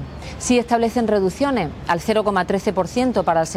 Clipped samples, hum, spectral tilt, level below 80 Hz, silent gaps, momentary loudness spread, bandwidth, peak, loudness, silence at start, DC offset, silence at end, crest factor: under 0.1%; none; -5 dB/octave; -42 dBFS; none; 5 LU; 15.5 kHz; -6 dBFS; -20 LUFS; 0 s; under 0.1%; 0 s; 14 dB